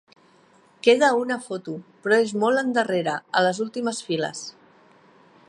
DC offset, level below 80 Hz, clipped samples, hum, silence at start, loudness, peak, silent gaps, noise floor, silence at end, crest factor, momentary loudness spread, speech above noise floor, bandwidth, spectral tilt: under 0.1%; -78 dBFS; under 0.1%; none; 0.85 s; -23 LUFS; -4 dBFS; none; -57 dBFS; 1 s; 20 dB; 14 LU; 34 dB; 11.5 kHz; -4 dB/octave